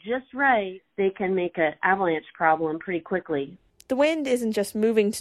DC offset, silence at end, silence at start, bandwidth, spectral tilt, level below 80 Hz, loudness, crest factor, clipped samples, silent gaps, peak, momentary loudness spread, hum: under 0.1%; 0 s; 0.05 s; 14.5 kHz; -5 dB/octave; -64 dBFS; -25 LUFS; 18 dB; under 0.1%; none; -8 dBFS; 8 LU; none